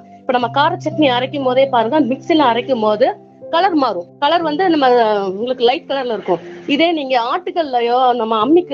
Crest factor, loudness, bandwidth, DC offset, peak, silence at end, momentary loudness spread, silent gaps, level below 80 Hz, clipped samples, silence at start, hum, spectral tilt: 14 dB; -15 LUFS; 7.2 kHz; under 0.1%; 0 dBFS; 0 s; 6 LU; none; -62 dBFS; under 0.1%; 0.1 s; none; -6 dB/octave